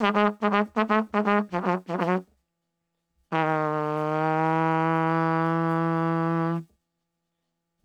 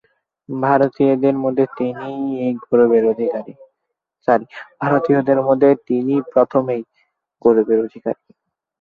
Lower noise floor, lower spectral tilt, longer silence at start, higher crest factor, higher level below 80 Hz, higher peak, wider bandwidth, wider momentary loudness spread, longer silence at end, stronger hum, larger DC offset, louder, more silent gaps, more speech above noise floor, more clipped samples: about the same, -80 dBFS vs -78 dBFS; second, -8 dB/octave vs -10 dB/octave; second, 0 s vs 0.5 s; about the same, 20 dB vs 16 dB; second, -70 dBFS vs -62 dBFS; second, -6 dBFS vs -2 dBFS; first, 8 kHz vs 4.9 kHz; second, 4 LU vs 12 LU; first, 1.2 s vs 0.65 s; neither; neither; second, -25 LUFS vs -17 LUFS; neither; second, 57 dB vs 61 dB; neither